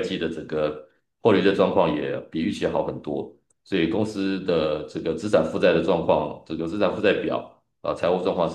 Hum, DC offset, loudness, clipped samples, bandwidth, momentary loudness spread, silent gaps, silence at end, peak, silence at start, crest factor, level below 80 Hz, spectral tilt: none; under 0.1%; -24 LUFS; under 0.1%; 10 kHz; 11 LU; none; 0 s; -4 dBFS; 0 s; 18 dB; -56 dBFS; -6.5 dB/octave